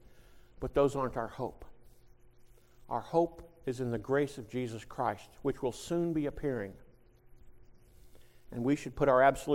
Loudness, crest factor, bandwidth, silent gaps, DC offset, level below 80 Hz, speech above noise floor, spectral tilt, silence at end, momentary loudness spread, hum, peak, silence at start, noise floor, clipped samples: -33 LUFS; 22 dB; 16 kHz; none; under 0.1%; -54 dBFS; 27 dB; -6.5 dB/octave; 0 s; 12 LU; none; -12 dBFS; 0.15 s; -59 dBFS; under 0.1%